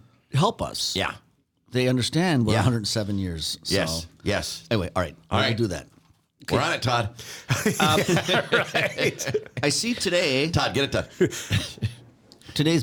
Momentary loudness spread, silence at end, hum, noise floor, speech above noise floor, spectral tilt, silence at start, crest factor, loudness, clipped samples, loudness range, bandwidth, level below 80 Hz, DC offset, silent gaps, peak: 8 LU; 0 s; none; -58 dBFS; 34 dB; -4.5 dB/octave; 0.3 s; 18 dB; -24 LUFS; under 0.1%; 4 LU; 19.5 kHz; -52 dBFS; under 0.1%; none; -6 dBFS